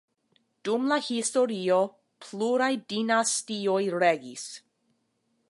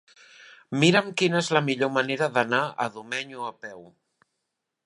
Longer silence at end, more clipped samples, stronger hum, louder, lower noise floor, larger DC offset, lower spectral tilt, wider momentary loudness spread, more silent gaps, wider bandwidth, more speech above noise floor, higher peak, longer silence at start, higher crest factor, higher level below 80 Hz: about the same, 0.9 s vs 1 s; neither; neither; about the same, -26 LUFS vs -24 LUFS; second, -74 dBFS vs -82 dBFS; neither; second, -3 dB/octave vs -4.5 dB/octave; about the same, 14 LU vs 15 LU; neither; about the same, 11.5 kHz vs 11 kHz; second, 47 dB vs 57 dB; second, -10 dBFS vs -4 dBFS; first, 0.65 s vs 0.4 s; about the same, 18 dB vs 22 dB; second, -82 dBFS vs -74 dBFS